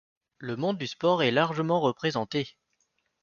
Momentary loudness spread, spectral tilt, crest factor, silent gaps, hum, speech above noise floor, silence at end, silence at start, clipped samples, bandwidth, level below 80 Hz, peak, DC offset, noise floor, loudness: 12 LU; -6 dB/octave; 20 dB; none; none; 48 dB; 0.75 s; 0.4 s; under 0.1%; 7.2 kHz; -68 dBFS; -10 dBFS; under 0.1%; -75 dBFS; -27 LUFS